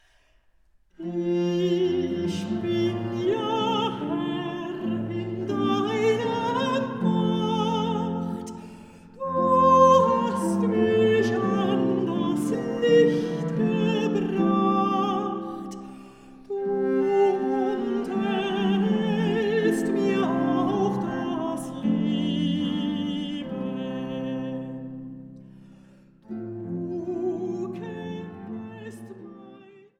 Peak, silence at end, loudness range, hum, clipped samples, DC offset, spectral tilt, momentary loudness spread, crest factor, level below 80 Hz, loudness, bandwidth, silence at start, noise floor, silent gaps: -6 dBFS; 0.3 s; 12 LU; none; under 0.1%; under 0.1%; -7 dB/octave; 15 LU; 20 dB; -62 dBFS; -25 LUFS; 13.5 kHz; 1 s; -61 dBFS; none